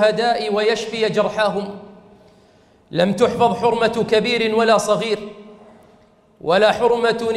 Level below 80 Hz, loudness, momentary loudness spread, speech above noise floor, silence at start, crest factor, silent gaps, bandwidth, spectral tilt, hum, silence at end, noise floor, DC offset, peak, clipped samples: -54 dBFS; -18 LUFS; 11 LU; 35 dB; 0 s; 18 dB; none; 12.5 kHz; -4.5 dB/octave; none; 0 s; -52 dBFS; under 0.1%; -2 dBFS; under 0.1%